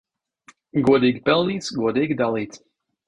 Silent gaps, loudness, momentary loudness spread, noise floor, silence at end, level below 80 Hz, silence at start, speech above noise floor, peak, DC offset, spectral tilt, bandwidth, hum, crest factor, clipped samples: none; -21 LUFS; 10 LU; -55 dBFS; 0.5 s; -56 dBFS; 0.75 s; 35 dB; -4 dBFS; under 0.1%; -6 dB/octave; 10.5 kHz; none; 18 dB; under 0.1%